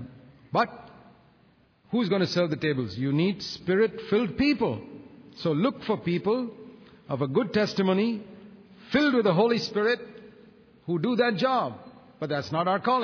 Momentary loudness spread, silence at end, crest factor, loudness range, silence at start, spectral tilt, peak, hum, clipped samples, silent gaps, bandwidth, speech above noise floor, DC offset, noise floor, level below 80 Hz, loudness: 14 LU; 0 s; 16 dB; 3 LU; 0 s; -6.5 dB/octave; -10 dBFS; none; under 0.1%; none; 5.4 kHz; 36 dB; under 0.1%; -61 dBFS; -62 dBFS; -26 LUFS